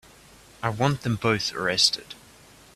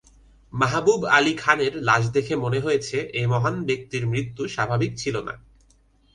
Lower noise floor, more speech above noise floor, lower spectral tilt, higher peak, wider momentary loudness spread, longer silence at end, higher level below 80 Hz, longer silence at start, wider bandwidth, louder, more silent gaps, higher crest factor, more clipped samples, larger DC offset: second, -52 dBFS vs -59 dBFS; second, 27 dB vs 36 dB; second, -3.5 dB/octave vs -5 dB/octave; second, -6 dBFS vs -2 dBFS; first, 15 LU vs 10 LU; second, 0.6 s vs 0.75 s; about the same, -56 dBFS vs -52 dBFS; about the same, 0.6 s vs 0.55 s; first, 14.5 kHz vs 10.5 kHz; about the same, -24 LUFS vs -23 LUFS; neither; about the same, 22 dB vs 22 dB; neither; neither